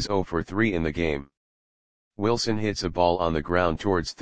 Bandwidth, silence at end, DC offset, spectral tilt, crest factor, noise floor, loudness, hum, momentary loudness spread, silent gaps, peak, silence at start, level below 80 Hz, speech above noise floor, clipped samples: 9.8 kHz; 0 s; 0.9%; -5.5 dB/octave; 20 dB; under -90 dBFS; -25 LUFS; none; 5 LU; 1.37-2.11 s; -6 dBFS; 0 s; -44 dBFS; over 65 dB; under 0.1%